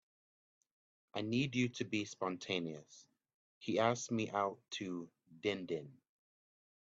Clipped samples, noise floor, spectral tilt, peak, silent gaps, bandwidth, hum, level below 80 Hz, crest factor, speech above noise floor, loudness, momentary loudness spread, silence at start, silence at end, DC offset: under 0.1%; under -90 dBFS; -5 dB/octave; -18 dBFS; 3.34-3.61 s; 8 kHz; none; -80 dBFS; 24 dB; over 51 dB; -39 LUFS; 12 LU; 1.15 s; 1 s; under 0.1%